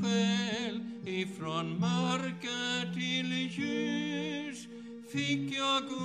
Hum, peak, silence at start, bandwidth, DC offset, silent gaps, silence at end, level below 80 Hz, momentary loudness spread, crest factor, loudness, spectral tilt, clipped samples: 50 Hz at -70 dBFS; -18 dBFS; 0 s; 11 kHz; under 0.1%; none; 0 s; -76 dBFS; 9 LU; 16 dB; -33 LUFS; -4.5 dB/octave; under 0.1%